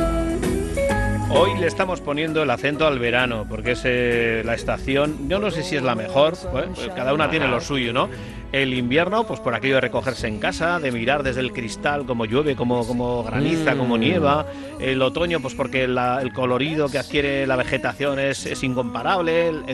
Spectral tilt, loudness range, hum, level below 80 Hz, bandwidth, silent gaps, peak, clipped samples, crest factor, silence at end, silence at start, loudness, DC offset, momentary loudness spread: -5.5 dB/octave; 1 LU; none; -38 dBFS; 12.5 kHz; none; -4 dBFS; under 0.1%; 18 dB; 0 s; 0 s; -21 LUFS; under 0.1%; 5 LU